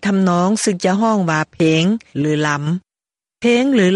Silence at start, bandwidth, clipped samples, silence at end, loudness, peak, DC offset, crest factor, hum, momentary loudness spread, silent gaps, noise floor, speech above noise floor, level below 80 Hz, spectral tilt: 0 s; 11.5 kHz; under 0.1%; 0 s; -17 LUFS; -4 dBFS; under 0.1%; 14 dB; none; 6 LU; none; under -90 dBFS; over 75 dB; -58 dBFS; -5.5 dB/octave